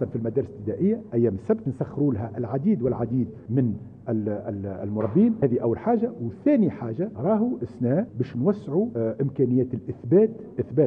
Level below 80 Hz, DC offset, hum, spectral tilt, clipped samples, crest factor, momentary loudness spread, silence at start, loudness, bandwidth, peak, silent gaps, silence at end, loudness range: -60 dBFS; under 0.1%; none; -12 dB/octave; under 0.1%; 16 dB; 9 LU; 0 s; -25 LUFS; 3.8 kHz; -8 dBFS; none; 0 s; 2 LU